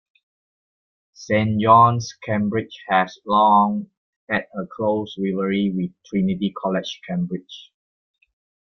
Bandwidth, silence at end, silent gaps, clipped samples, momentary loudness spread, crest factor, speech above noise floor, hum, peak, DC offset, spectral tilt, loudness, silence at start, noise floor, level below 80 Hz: 6.8 kHz; 1.05 s; 3.97-4.27 s; under 0.1%; 13 LU; 20 dB; over 70 dB; none; -2 dBFS; under 0.1%; -6.5 dB/octave; -20 LUFS; 1.2 s; under -90 dBFS; -60 dBFS